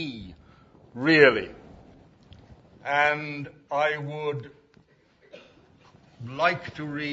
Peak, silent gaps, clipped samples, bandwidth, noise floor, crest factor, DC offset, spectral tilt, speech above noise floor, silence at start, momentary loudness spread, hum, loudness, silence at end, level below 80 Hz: -2 dBFS; none; under 0.1%; 7.8 kHz; -61 dBFS; 26 dB; under 0.1%; -6 dB/octave; 36 dB; 0 s; 23 LU; none; -24 LUFS; 0 s; -60 dBFS